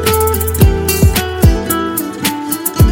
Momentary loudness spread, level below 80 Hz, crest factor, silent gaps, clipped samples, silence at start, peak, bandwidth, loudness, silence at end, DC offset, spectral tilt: 6 LU; -18 dBFS; 12 dB; none; under 0.1%; 0 s; 0 dBFS; 17.5 kHz; -13 LUFS; 0 s; under 0.1%; -5 dB/octave